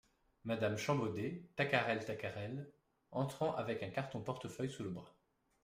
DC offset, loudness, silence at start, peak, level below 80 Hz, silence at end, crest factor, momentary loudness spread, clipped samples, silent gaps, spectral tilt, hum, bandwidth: under 0.1%; -40 LUFS; 0.45 s; -18 dBFS; -74 dBFS; 0.55 s; 24 dB; 11 LU; under 0.1%; none; -6 dB/octave; none; 15.5 kHz